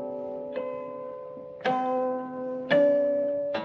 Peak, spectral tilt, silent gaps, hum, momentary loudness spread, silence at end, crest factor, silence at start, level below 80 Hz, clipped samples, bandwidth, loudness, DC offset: -10 dBFS; -7 dB/octave; none; none; 16 LU; 0 s; 18 dB; 0 s; -74 dBFS; under 0.1%; 6.2 kHz; -28 LUFS; under 0.1%